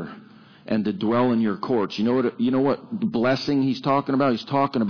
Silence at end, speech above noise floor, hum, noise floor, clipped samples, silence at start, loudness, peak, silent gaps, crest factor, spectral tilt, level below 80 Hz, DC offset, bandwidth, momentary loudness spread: 0 s; 26 dB; none; -48 dBFS; under 0.1%; 0 s; -23 LUFS; -10 dBFS; none; 12 dB; -7.5 dB/octave; -62 dBFS; under 0.1%; 5.4 kHz; 5 LU